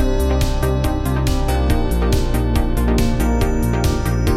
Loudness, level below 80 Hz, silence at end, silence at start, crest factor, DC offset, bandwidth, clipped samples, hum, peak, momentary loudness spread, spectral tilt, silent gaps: -19 LUFS; -18 dBFS; 0 s; 0 s; 12 dB; 0.4%; 15.5 kHz; under 0.1%; none; -4 dBFS; 1 LU; -6.5 dB/octave; none